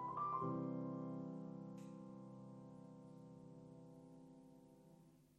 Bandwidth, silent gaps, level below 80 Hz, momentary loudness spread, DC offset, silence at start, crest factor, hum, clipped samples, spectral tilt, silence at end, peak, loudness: 11.5 kHz; none; -82 dBFS; 21 LU; under 0.1%; 0 s; 18 dB; none; under 0.1%; -9.5 dB/octave; 0 s; -32 dBFS; -50 LUFS